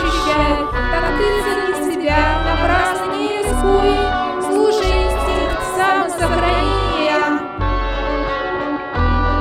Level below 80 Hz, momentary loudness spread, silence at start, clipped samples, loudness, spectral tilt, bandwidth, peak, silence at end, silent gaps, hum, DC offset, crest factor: -24 dBFS; 5 LU; 0 s; under 0.1%; -17 LUFS; -5 dB/octave; 15.5 kHz; -2 dBFS; 0 s; none; none; under 0.1%; 14 dB